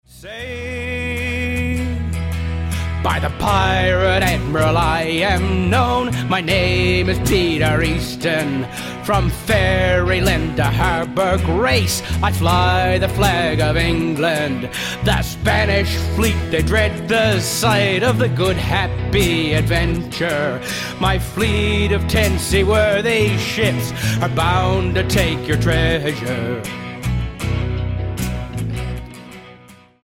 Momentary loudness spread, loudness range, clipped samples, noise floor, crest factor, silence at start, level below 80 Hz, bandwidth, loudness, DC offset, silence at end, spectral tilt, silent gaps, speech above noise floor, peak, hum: 8 LU; 3 LU; under 0.1%; -45 dBFS; 14 dB; 0.15 s; -28 dBFS; 16.5 kHz; -18 LUFS; under 0.1%; 0.3 s; -5 dB/octave; none; 28 dB; -4 dBFS; none